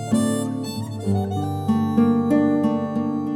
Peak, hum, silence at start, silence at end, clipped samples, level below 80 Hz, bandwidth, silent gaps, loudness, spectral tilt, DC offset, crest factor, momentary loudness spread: -6 dBFS; none; 0 s; 0 s; under 0.1%; -58 dBFS; 15.5 kHz; none; -22 LUFS; -7 dB/octave; under 0.1%; 14 dB; 8 LU